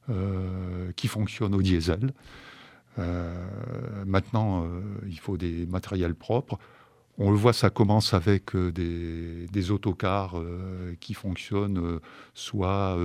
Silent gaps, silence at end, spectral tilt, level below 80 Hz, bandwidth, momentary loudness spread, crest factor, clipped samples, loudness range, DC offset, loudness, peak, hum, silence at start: none; 0 s; -7 dB/octave; -46 dBFS; 14.5 kHz; 14 LU; 24 dB; under 0.1%; 5 LU; under 0.1%; -28 LUFS; -4 dBFS; none; 0.05 s